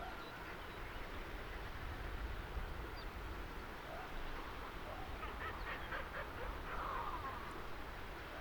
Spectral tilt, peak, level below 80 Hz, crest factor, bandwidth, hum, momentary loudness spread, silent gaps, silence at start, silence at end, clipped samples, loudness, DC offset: -5 dB/octave; -32 dBFS; -50 dBFS; 14 dB; 19.5 kHz; none; 5 LU; none; 0 s; 0 s; under 0.1%; -47 LUFS; under 0.1%